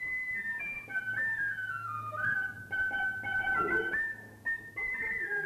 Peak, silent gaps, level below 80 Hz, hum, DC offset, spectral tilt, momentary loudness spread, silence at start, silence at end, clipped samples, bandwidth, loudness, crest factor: -20 dBFS; none; -62 dBFS; none; under 0.1%; -4.5 dB/octave; 6 LU; 0 s; 0 s; under 0.1%; 14 kHz; -33 LUFS; 14 dB